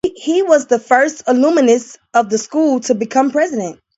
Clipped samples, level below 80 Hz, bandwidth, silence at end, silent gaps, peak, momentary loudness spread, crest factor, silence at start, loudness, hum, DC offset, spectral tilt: under 0.1%; -58 dBFS; 8.2 kHz; 0.25 s; none; 0 dBFS; 5 LU; 14 dB; 0.05 s; -15 LUFS; none; under 0.1%; -4 dB/octave